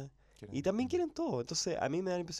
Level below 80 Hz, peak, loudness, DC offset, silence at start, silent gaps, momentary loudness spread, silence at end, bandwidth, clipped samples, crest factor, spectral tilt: -64 dBFS; -20 dBFS; -35 LUFS; under 0.1%; 0 s; none; 10 LU; 0 s; 13.5 kHz; under 0.1%; 16 dB; -4.5 dB/octave